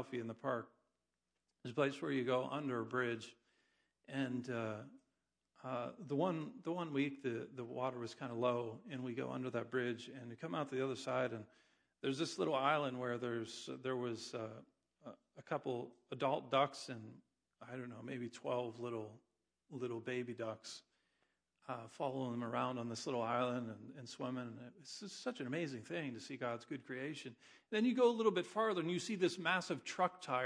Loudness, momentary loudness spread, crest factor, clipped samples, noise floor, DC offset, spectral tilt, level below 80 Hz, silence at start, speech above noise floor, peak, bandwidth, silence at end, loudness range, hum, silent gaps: -41 LUFS; 15 LU; 22 dB; under 0.1%; under -90 dBFS; under 0.1%; -5.5 dB/octave; -88 dBFS; 0 s; over 49 dB; -20 dBFS; 10.5 kHz; 0 s; 7 LU; none; none